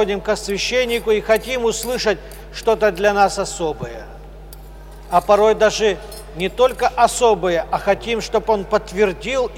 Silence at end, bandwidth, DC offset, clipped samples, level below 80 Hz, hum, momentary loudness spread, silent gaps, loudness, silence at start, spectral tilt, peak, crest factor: 0 s; 16.5 kHz; under 0.1%; under 0.1%; -38 dBFS; none; 10 LU; none; -18 LUFS; 0 s; -3.5 dB/octave; -2 dBFS; 16 dB